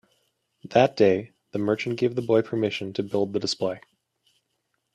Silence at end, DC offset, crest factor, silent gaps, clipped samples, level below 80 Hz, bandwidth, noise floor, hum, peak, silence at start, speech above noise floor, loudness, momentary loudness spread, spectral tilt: 1.15 s; under 0.1%; 22 dB; none; under 0.1%; -68 dBFS; 11.5 kHz; -76 dBFS; none; -4 dBFS; 0.65 s; 52 dB; -25 LUFS; 9 LU; -6 dB/octave